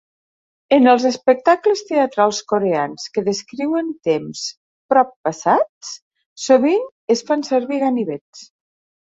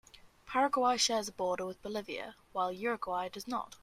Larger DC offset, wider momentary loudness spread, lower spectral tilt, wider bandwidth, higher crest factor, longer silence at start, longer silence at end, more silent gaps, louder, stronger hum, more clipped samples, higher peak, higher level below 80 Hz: neither; about the same, 13 LU vs 12 LU; first, -4.5 dB/octave vs -2 dB/octave; second, 8 kHz vs 15.5 kHz; about the same, 16 dB vs 18 dB; first, 0.7 s vs 0.25 s; first, 0.6 s vs 0.05 s; first, 4.57-4.89 s, 5.16-5.24 s, 5.69-5.81 s, 6.02-6.11 s, 6.26-6.36 s, 6.92-7.07 s, 8.21-8.33 s vs none; first, -18 LUFS vs -34 LUFS; neither; neither; first, -2 dBFS vs -16 dBFS; about the same, -66 dBFS vs -68 dBFS